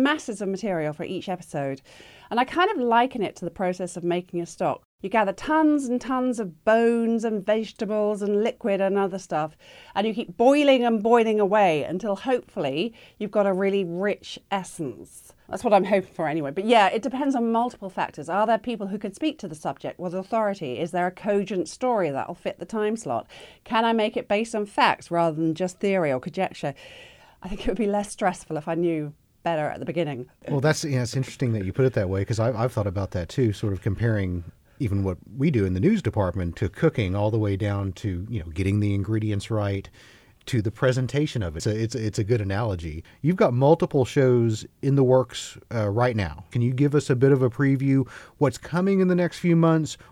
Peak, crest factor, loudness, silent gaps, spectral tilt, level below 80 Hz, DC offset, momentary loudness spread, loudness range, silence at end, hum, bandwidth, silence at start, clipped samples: -6 dBFS; 18 dB; -24 LUFS; 4.85-4.98 s; -6.5 dB/octave; -50 dBFS; under 0.1%; 11 LU; 5 LU; 0.15 s; none; 13.5 kHz; 0 s; under 0.1%